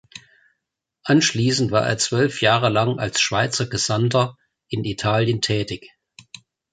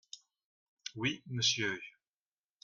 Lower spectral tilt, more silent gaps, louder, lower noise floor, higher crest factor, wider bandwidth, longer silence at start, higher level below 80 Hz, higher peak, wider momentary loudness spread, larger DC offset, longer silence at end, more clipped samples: first, -4.5 dB/octave vs -2.5 dB/octave; second, none vs 0.45-0.77 s; first, -20 LUFS vs -34 LUFS; second, -80 dBFS vs under -90 dBFS; about the same, 18 dB vs 22 dB; about the same, 9.6 kHz vs 10.5 kHz; about the same, 0.15 s vs 0.15 s; first, -52 dBFS vs -76 dBFS; first, -2 dBFS vs -18 dBFS; second, 9 LU vs 22 LU; neither; about the same, 0.85 s vs 0.75 s; neither